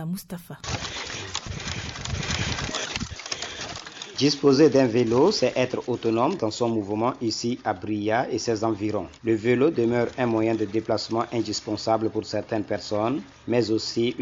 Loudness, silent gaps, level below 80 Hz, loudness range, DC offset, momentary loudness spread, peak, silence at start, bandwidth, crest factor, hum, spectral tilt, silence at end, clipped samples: -25 LUFS; none; -48 dBFS; 8 LU; under 0.1%; 11 LU; -8 dBFS; 0 s; 13 kHz; 16 dB; none; -5 dB/octave; 0 s; under 0.1%